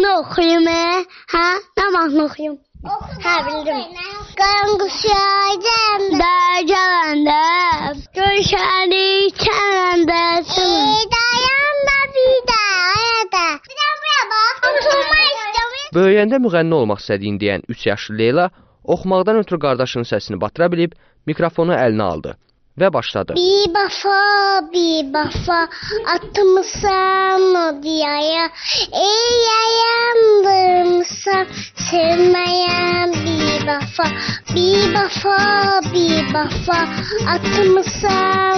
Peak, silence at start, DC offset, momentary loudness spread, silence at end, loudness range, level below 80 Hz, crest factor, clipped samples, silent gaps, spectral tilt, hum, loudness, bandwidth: -4 dBFS; 0 s; under 0.1%; 8 LU; 0 s; 4 LU; -42 dBFS; 12 dB; under 0.1%; none; -2 dB/octave; none; -15 LUFS; 6.6 kHz